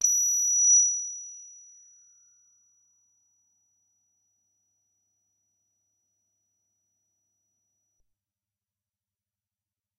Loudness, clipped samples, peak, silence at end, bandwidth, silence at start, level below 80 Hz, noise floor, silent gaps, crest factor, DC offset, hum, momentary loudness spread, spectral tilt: -20 LUFS; under 0.1%; -10 dBFS; 8.5 s; 12 kHz; 0 s; -90 dBFS; under -90 dBFS; none; 22 dB; under 0.1%; none; 23 LU; 6 dB/octave